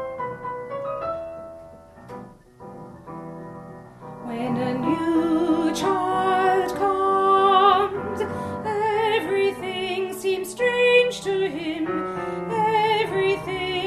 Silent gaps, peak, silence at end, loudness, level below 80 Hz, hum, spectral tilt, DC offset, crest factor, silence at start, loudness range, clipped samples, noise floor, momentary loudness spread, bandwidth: none; -4 dBFS; 0 s; -22 LUFS; -56 dBFS; none; -5 dB/octave; under 0.1%; 18 dB; 0 s; 15 LU; under 0.1%; -44 dBFS; 23 LU; 13.5 kHz